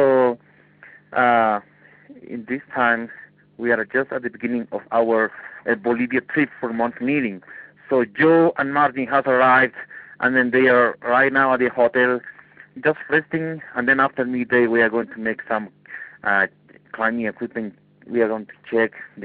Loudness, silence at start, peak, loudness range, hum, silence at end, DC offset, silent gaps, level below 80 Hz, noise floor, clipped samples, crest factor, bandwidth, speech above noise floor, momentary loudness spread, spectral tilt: -20 LUFS; 0 s; -4 dBFS; 6 LU; none; 0 s; under 0.1%; none; -64 dBFS; -50 dBFS; under 0.1%; 16 dB; 4.8 kHz; 30 dB; 13 LU; -10.5 dB/octave